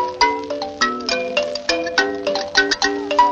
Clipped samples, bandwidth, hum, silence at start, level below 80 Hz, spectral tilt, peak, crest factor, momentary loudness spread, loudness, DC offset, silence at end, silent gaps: under 0.1%; 8.6 kHz; none; 0 s; -50 dBFS; -1.5 dB/octave; -2 dBFS; 18 dB; 5 LU; -19 LUFS; under 0.1%; 0 s; none